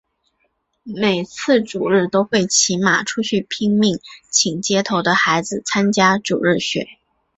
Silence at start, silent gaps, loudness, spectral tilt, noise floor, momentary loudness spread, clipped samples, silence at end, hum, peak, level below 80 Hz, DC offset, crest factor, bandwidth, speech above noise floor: 0.85 s; none; -17 LUFS; -3.5 dB/octave; -68 dBFS; 6 LU; under 0.1%; 0.45 s; none; -2 dBFS; -58 dBFS; under 0.1%; 16 dB; 8.4 kHz; 50 dB